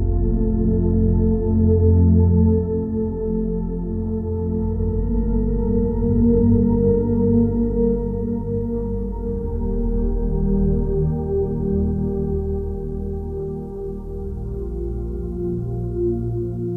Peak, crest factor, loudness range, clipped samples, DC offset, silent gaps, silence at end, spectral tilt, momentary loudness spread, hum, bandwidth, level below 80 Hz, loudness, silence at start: -6 dBFS; 14 dB; 8 LU; under 0.1%; under 0.1%; none; 0 s; -14 dB/octave; 11 LU; none; 2 kHz; -26 dBFS; -21 LUFS; 0 s